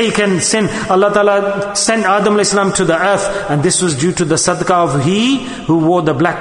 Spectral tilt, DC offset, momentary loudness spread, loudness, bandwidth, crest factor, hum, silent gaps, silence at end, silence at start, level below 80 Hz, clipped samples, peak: -4 dB/octave; under 0.1%; 3 LU; -13 LUFS; 11 kHz; 12 dB; none; none; 0 s; 0 s; -44 dBFS; under 0.1%; 0 dBFS